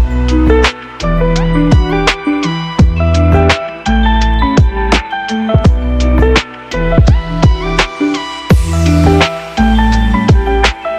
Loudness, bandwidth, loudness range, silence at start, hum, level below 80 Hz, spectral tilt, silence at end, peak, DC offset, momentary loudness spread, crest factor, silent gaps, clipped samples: -12 LUFS; 11 kHz; 1 LU; 0 s; none; -14 dBFS; -6 dB/octave; 0 s; 0 dBFS; under 0.1%; 6 LU; 10 dB; none; under 0.1%